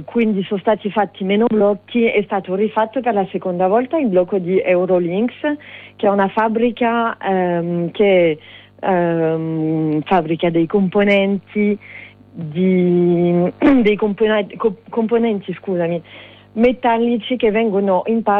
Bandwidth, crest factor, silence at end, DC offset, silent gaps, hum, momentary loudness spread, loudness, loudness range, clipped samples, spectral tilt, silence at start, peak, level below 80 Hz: 4.7 kHz; 12 dB; 0 s; under 0.1%; none; none; 8 LU; -17 LUFS; 2 LU; under 0.1%; -9.5 dB/octave; 0 s; -4 dBFS; -52 dBFS